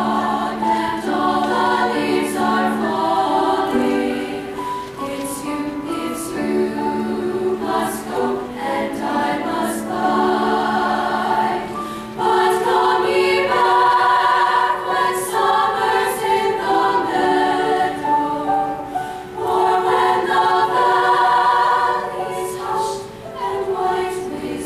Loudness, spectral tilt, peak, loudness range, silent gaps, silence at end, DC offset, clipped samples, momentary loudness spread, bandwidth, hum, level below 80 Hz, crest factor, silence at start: -18 LUFS; -4 dB/octave; -4 dBFS; 6 LU; none; 0 s; under 0.1%; under 0.1%; 10 LU; 15 kHz; none; -52 dBFS; 14 dB; 0 s